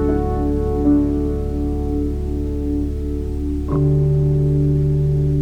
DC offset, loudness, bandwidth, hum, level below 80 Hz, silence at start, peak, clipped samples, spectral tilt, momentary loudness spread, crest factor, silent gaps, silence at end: under 0.1%; -19 LUFS; 5.4 kHz; none; -24 dBFS; 0 s; -4 dBFS; under 0.1%; -10.5 dB/octave; 7 LU; 14 dB; none; 0 s